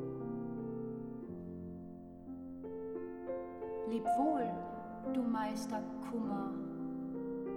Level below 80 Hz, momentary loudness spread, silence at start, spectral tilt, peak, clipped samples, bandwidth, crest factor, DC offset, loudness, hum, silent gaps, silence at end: -66 dBFS; 13 LU; 0 s; -7 dB/octave; -22 dBFS; under 0.1%; 14.5 kHz; 16 dB; under 0.1%; -40 LUFS; none; none; 0 s